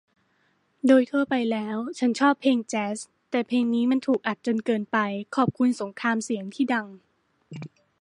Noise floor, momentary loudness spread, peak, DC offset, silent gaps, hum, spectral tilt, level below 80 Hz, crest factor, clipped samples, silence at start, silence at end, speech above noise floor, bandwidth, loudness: -68 dBFS; 12 LU; -8 dBFS; under 0.1%; none; none; -5 dB/octave; -72 dBFS; 18 dB; under 0.1%; 0.85 s; 0.35 s; 44 dB; 11 kHz; -25 LUFS